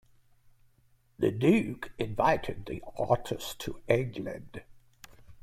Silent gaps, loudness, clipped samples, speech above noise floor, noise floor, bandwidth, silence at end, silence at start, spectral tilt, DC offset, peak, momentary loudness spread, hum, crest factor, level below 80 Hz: none; -30 LUFS; under 0.1%; 36 dB; -65 dBFS; 16 kHz; 0 s; 1.2 s; -6.5 dB/octave; under 0.1%; -10 dBFS; 15 LU; none; 22 dB; -54 dBFS